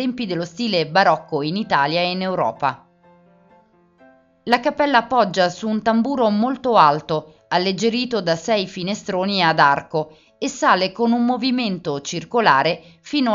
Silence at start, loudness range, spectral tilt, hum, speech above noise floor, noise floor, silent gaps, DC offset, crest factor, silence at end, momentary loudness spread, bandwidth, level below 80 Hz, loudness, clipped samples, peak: 0 s; 4 LU; -5 dB/octave; none; 35 dB; -54 dBFS; none; under 0.1%; 20 dB; 0 s; 10 LU; 7.8 kHz; -60 dBFS; -19 LUFS; under 0.1%; 0 dBFS